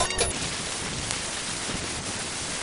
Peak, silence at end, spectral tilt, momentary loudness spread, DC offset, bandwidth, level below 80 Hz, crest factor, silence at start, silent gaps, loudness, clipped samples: -2 dBFS; 0 s; -2 dB/octave; 4 LU; under 0.1%; 11 kHz; -44 dBFS; 28 dB; 0 s; none; -28 LUFS; under 0.1%